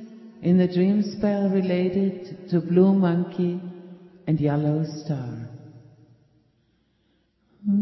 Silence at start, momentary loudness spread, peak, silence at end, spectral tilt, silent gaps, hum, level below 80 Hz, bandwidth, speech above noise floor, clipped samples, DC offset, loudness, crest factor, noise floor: 0 s; 18 LU; -6 dBFS; 0 s; -9.5 dB/octave; none; none; -60 dBFS; 6 kHz; 45 dB; under 0.1%; under 0.1%; -23 LUFS; 18 dB; -67 dBFS